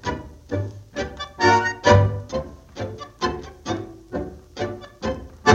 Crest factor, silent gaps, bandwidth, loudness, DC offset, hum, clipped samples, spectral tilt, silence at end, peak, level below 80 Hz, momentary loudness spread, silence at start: 22 dB; none; 8 kHz; -24 LUFS; under 0.1%; none; under 0.1%; -5.5 dB/octave; 0 s; -2 dBFS; -42 dBFS; 16 LU; 0.05 s